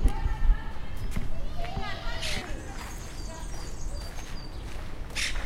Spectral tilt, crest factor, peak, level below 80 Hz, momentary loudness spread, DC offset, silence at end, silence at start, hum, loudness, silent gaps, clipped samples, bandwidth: -4 dB/octave; 20 dB; -10 dBFS; -30 dBFS; 10 LU; under 0.1%; 0 s; 0 s; none; -36 LUFS; none; under 0.1%; 15 kHz